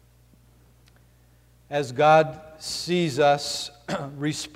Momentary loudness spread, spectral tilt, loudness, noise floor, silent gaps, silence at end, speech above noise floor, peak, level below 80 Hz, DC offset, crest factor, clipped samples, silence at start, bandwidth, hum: 14 LU; -4.5 dB/octave; -23 LUFS; -57 dBFS; none; 0.1 s; 34 dB; -6 dBFS; -60 dBFS; under 0.1%; 18 dB; under 0.1%; 1.7 s; 16 kHz; 60 Hz at -55 dBFS